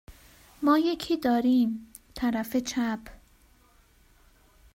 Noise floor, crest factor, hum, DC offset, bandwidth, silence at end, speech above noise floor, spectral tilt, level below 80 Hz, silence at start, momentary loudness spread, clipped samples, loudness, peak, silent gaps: -60 dBFS; 18 dB; none; under 0.1%; 16 kHz; 1.6 s; 35 dB; -4.5 dB/octave; -56 dBFS; 0.1 s; 11 LU; under 0.1%; -27 LUFS; -10 dBFS; none